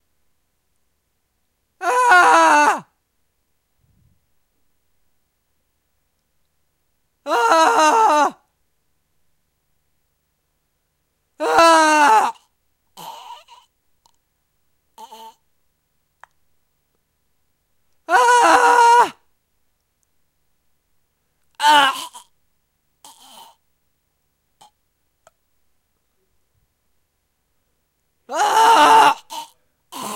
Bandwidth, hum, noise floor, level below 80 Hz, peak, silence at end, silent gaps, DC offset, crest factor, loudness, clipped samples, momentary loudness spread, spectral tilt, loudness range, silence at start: 16 kHz; none; -70 dBFS; -66 dBFS; -2 dBFS; 0 s; none; under 0.1%; 18 dB; -14 LUFS; under 0.1%; 24 LU; -1 dB/octave; 7 LU; 1.8 s